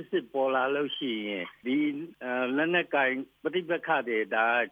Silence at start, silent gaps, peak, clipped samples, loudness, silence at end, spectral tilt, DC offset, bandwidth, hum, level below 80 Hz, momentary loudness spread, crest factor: 0 s; none; -12 dBFS; under 0.1%; -29 LUFS; 0 s; -7 dB/octave; under 0.1%; 4.9 kHz; none; -78 dBFS; 8 LU; 16 dB